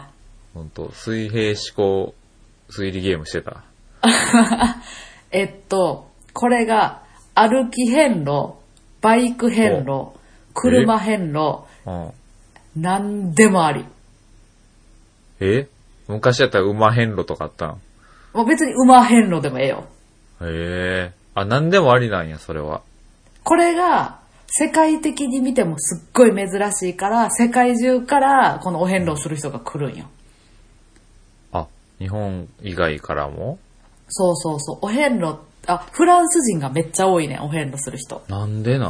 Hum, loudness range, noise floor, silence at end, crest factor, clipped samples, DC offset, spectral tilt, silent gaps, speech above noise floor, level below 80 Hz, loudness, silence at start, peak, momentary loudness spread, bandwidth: none; 8 LU; -51 dBFS; 0 s; 18 dB; under 0.1%; under 0.1%; -5 dB/octave; none; 33 dB; -46 dBFS; -18 LUFS; 0 s; 0 dBFS; 16 LU; 11 kHz